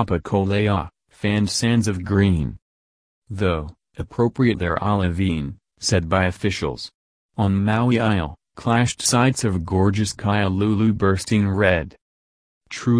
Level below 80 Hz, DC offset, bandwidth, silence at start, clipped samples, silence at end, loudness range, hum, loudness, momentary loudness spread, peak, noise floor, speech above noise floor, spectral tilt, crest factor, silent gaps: -42 dBFS; under 0.1%; 11 kHz; 0 s; under 0.1%; 0 s; 3 LU; none; -21 LUFS; 13 LU; -2 dBFS; under -90 dBFS; over 70 dB; -5.5 dB/octave; 18 dB; 2.62-3.22 s, 6.94-7.29 s, 12.01-12.61 s